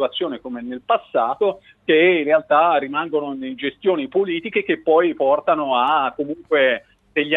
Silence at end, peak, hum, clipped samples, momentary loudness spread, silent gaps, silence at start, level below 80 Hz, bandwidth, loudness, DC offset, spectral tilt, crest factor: 0 s; -2 dBFS; none; under 0.1%; 11 LU; none; 0 s; -64 dBFS; 4.1 kHz; -19 LUFS; under 0.1%; -7 dB/octave; 16 dB